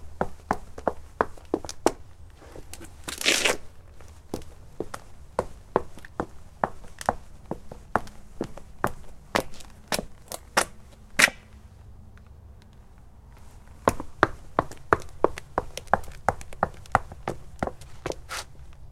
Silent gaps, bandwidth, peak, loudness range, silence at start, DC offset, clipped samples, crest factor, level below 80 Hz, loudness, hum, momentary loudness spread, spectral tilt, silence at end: none; 16.5 kHz; 0 dBFS; 6 LU; 0 s; under 0.1%; under 0.1%; 30 dB; -46 dBFS; -29 LUFS; none; 22 LU; -3 dB/octave; 0 s